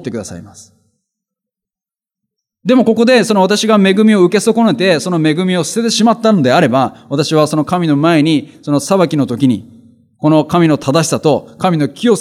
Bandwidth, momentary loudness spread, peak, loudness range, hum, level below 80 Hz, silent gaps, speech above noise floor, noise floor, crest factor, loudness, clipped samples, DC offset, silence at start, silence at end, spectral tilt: 15 kHz; 8 LU; 0 dBFS; 3 LU; none; -58 dBFS; none; 77 dB; -89 dBFS; 12 dB; -12 LUFS; under 0.1%; under 0.1%; 0 s; 0 s; -5.5 dB/octave